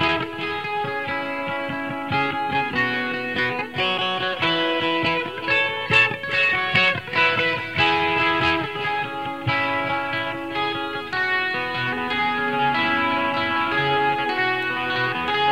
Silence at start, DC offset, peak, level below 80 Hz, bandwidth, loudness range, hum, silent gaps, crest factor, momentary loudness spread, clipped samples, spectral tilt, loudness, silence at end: 0 s; 0.3%; -2 dBFS; -54 dBFS; 16 kHz; 5 LU; none; none; 20 dB; 8 LU; under 0.1%; -5 dB/octave; -21 LUFS; 0 s